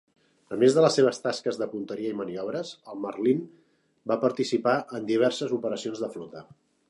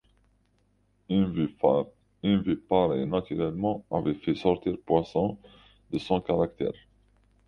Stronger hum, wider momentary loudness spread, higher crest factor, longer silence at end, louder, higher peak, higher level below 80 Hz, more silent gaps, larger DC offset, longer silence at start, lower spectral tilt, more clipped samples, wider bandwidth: second, none vs 50 Hz at -50 dBFS; first, 16 LU vs 9 LU; about the same, 20 dB vs 20 dB; second, 0.45 s vs 0.75 s; about the same, -27 LUFS vs -28 LUFS; about the same, -6 dBFS vs -8 dBFS; second, -76 dBFS vs -54 dBFS; neither; neither; second, 0.5 s vs 1.1 s; second, -5 dB/octave vs -9 dB/octave; neither; first, 11.5 kHz vs 6.8 kHz